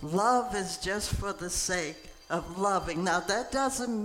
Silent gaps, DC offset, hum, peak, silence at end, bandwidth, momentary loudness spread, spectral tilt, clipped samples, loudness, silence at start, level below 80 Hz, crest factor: none; under 0.1%; none; -14 dBFS; 0 s; 17 kHz; 9 LU; -3.5 dB/octave; under 0.1%; -30 LUFS; 0 s; -46 dBFS; 18 dB